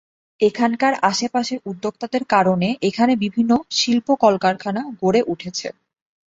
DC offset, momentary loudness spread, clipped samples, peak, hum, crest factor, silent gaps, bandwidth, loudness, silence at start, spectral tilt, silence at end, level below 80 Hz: under 0.1%; 10 LU; under 0.1%; -2 dBFS; none; 18 dB; none; 7.8 kHz; -19 LUFS; 0.4 s; -4.5 dB/octave; 0.6 s; -60 dBFS